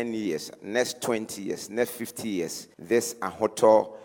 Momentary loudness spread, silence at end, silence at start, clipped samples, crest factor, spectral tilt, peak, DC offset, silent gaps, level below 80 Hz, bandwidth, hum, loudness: 13 LU; 0 s; 0 s; under 0.1%; 20 dB; -4 dB/octave; -8 dBFS; under 0.1%; none; -70 dBFS; 18 kHz; none; -27 LUFS